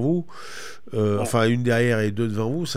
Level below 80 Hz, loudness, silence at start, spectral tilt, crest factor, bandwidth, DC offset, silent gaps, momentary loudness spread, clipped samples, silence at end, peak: -60 dBFS; -23 LUFS; 0 s; -6 dB/octave; 14 dB; 15.5 kHz; 2%; none; 17 LU; under 0.1%; 0 s; -8 dBFS